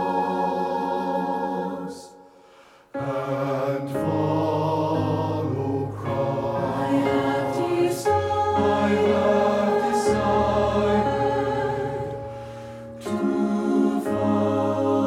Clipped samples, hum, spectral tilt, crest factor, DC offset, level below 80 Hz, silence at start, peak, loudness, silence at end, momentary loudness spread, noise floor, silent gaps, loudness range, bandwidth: under 0.1%; none; -7 dB/octave; 14 dB; under 0.1%; -48 dBFS; 0 s; -8 dBFS; -23 LUFS; 0 s; 10 LU; -52 dBFS; none; 7 LU; 15.5 kHz